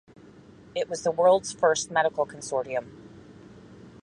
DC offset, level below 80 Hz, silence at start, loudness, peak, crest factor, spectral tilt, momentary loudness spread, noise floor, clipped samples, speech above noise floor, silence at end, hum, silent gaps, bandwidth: under 0.1%; -64 dBFS; 0.75 s; -26 LUFS; -8 dBFS; 20 dB; -3 dB/octave; 12 LU; -50 dBFS; under 0.1%; 26 dB; 0.15 s; none; none; 11.5 kHz